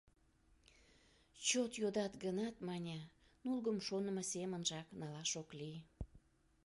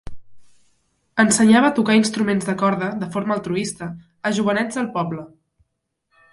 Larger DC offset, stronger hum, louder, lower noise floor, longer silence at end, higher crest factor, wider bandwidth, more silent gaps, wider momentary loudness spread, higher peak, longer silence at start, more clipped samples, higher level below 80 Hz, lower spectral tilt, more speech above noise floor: neither; neither; second, -42 LUFS vs -19 LUFS; about the same, -73 dBFS vs -74 dBFS; second, 0.45 s vs 1.05 s; about the same, 22 dB vs 18 dB; about the same, 11.5 kHz vs 11.5 kHz; neither; about the same, 14 LU vs 14 LU; second, -22 dBFS vs -2 dBFS; first, 1.35 s vs 0.05 s; neither; second, -66 dBFS vs -54 dBFS; about the same, -3.5 dB/octave vs -4.5 dB/octave; second, 31 dB vs 55 dB